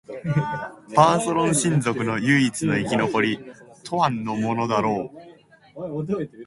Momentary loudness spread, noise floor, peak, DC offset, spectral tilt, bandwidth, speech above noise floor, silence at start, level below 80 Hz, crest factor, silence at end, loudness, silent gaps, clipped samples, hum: 13 LU; -48 dBFS; 0 dBFS; under 0.1%; -5 dB/octave; 12 kHz; 26 dB; 0.1 s; -58 dBFS; 22 dB; 0 s; -22 LUFS; none; under 0.1%; none